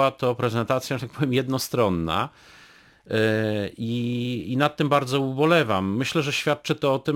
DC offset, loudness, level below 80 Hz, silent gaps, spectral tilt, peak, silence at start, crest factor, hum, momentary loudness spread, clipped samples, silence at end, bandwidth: under 0.1%; -24 LUFS; -56 dBFS; none; -5.5 dB/octave; -6 dBFS; 0 s; 18 dB; none; 7 LU; under 0.1%; 0 s; 17 kHz